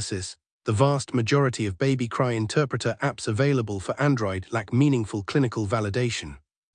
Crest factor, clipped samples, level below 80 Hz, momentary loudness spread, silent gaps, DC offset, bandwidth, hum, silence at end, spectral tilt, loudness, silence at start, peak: 18 dB; under 0.1%; -56 dBFS; 8 LU; 0.52-0.60 s; under 0.1%; 10 kHz; none; 0.4 s; -6 dB/octave; -25 LUFS; 0 s; -6 dBFS